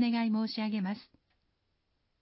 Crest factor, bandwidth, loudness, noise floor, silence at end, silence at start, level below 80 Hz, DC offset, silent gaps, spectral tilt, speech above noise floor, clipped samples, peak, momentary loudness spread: 14 dB; 5.6 kHz; -32 LUFS; -78 dBFS; 1.2 s; 0 s; -80 dBFS; under 0.1%; none; -4.5 dB/octave; 47 dB; under 0.1%; -20 dBFS; 9 LU